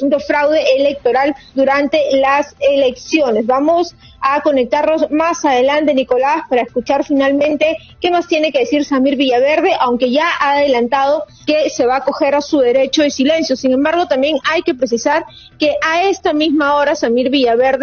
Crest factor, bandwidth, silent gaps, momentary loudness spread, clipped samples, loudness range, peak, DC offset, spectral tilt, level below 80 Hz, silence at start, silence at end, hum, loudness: 14 dB; 6.8 kHz; none; 4 LU; under 0.1%; 1 LU; 0 dBFS; under 0.1%; -1.5 dB/octave; -50 dBFS; 0 s; 0 s; none; -14 LUFS